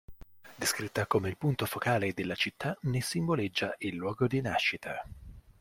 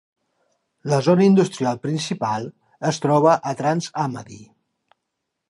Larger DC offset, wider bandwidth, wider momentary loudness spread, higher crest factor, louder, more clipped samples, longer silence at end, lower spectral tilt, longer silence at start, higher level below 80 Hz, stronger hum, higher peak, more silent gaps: neither; first, 16.5 kHz vs 11.5 kHz; second, 6 LU vs 15 LU; about the same, 20 dB vs 18 dB; second, -32 LUFS vs -20 LUFS; neither; second, 0.1 s vs 1.05 s; second, -4.5 dB/octave vs -6.5 dB/octave; second, 0.1 s vs 0.85 s; first, -58 dBFS vs -66 dBFS; neither; second, -14 dBFS vs -4 dBFS; neither